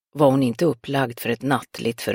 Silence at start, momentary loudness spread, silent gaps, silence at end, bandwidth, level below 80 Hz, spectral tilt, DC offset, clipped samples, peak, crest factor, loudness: 0.15 s; 8 LU; none; 0 s; 17 kHz; -62 dBFS; -6 dB/octave; under 0.1%; under 0.1%; -4 dBFS; 18 dB; -22 LUFS